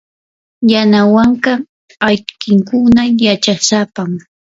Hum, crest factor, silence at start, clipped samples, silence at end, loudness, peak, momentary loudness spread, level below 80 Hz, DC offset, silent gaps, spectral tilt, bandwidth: none; 12 dB; 0.6 s; under 0.1%; 0.4 s; -12 LUFS; 0 dBFS; 11 LU; -46 dBFS; under 0.1%; 1.69-1.88 s; -4.5 dB/octave; 7.8 kHz